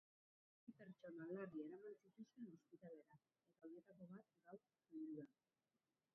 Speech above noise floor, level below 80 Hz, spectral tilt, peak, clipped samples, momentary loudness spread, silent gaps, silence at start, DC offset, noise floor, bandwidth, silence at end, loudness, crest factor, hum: over 32 dB; under -90 dBFS; -6 dB/octave; -40 dBFS; under 0.1%; 13 LU; none; 0.65 s; under 0.1%; under -90 dBFS; 3.7 kHz; 0.85 s; -59 LUFS; 20 dB; none